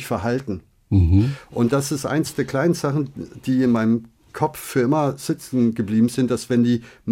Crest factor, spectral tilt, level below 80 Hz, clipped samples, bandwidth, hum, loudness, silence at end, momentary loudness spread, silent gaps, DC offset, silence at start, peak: 14 dB; -6.5 dB/octave; -44 dBFS; under 0.1%; 16.5 kHz; none; -21 LUFS; 0 s; 8 LU; none; under 0.1%; 0 s; -6 dBFS